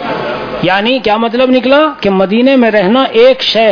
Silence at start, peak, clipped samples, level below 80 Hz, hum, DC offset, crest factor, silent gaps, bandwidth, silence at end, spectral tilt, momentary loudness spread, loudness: 0 s; 0 dBFS; 0.4%; -44 dBFS; none; under 0.1%; 10 dB; none; 5.4 kHz; 0 s; -6 dB/octave; 7 LU; -9 LUFS